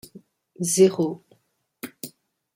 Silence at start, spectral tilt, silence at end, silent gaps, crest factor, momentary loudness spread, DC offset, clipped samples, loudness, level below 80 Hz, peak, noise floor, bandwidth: 0.15 s; -5 dB/octave; 0.45 s; none; 20 dB; 22 LU; under 0.1%; under 0.1%; -21 LUFS; -70 dBFS; -6 dBFS; -67 dBFS; 16.5 kHz